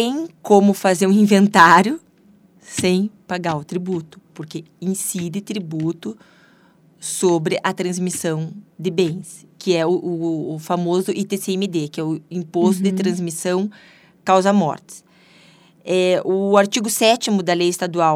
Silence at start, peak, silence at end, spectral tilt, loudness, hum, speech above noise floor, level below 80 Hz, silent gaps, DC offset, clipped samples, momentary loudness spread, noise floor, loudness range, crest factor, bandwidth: 0 s; 0 dBFS; 0 s; -5 dB/octave; -19 LUFS; none; 35 dB; -66 dBFS; none; under 0.1%; under 0.1%; 14 LU; -53 dBFS; 8 LU; 20 dB; 16 kHz